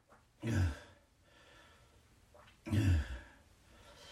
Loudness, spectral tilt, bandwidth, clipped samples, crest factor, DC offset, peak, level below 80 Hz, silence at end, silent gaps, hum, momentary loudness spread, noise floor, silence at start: -36 LUFS; -6.5 dB/octave; 13 kHz; under 0.1%; 20 dB; under 0.1%; -20 dBFS; -48 dBFS; 0 s; none; none; 27 LU; -66 dBFS; 0.4 s